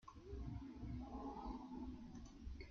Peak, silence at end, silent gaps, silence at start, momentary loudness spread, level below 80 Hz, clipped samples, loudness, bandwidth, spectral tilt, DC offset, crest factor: -38 dBFS; 0 s; none; 0.05 s; 6 LU; -56 dBFS; under 0.1%; -53 LUFS; 7.2 kHz; -7.5 dB/octave; under 0.1%; 14 dB